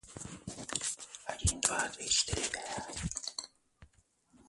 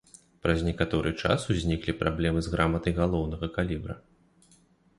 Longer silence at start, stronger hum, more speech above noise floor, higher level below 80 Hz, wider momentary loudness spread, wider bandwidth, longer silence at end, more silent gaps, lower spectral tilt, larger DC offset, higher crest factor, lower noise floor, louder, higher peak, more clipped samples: second, 0.05 s vs 0.45 s; neither; about the same, 33 dB vs 34 dB; second, -50 dBFS vs -40 dBFS; first, 15 LU vs 6 LU; about the same, 12 kHz vs 11.5 kHz; second, 0.05 s vs 1 s; neither; second, -1.5 dB/octave vs -6.5 dB/octave; neither; first, 30 dB vs 20 dB; first, -69 dBFS vs -62 dBFS; second, -34 LUFS vs -28 LUFS; about the same, -8 dBFS vs -8 dBFS; neither